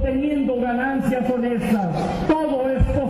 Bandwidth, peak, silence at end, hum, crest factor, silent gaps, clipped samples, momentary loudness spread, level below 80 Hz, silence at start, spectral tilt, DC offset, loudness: 14 kHz; -10 dBFS; 0 s; none; 10 dB; none; under 0.1%; 1 LU; -30 dBFS; 0 s; -8 dB/octave; under 0.1%; -21 LUFS